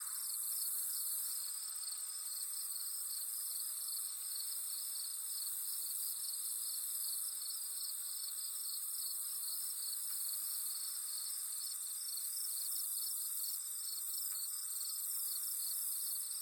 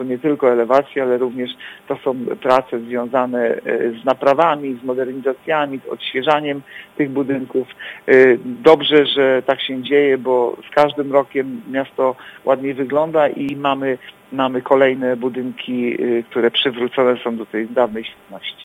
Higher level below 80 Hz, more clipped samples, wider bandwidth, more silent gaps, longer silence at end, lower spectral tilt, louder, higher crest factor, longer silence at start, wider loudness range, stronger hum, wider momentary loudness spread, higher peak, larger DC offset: second, under -90 dBFS vs -62 dBFS; neither; first, 19 kHz vs 12.5 kHz; neither; about the same, 0 s vs 0 s; second, 6.5 dB/octave vs -6 dB/octave; second, -38 LUFS vs -17 LUFS; about the same, 14 dB vs 18 dB; about the same, 0 s vs 0 s; second, 1 LU vs 5 LU; neither; second, 3 LU vs 10 LU; second, -26 dBFS vs 0 dBFS; neither